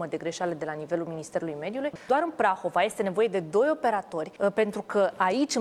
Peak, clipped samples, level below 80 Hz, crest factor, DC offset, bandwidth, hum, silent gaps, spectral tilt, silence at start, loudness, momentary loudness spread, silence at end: -10 dBFS; under 0.1%; -70 dBFS; 18 dB; under 0.1%; 14 kHz; none; none; -4.5 dB/octave; 0 s; -28 LUFS; 8 LU; 0 s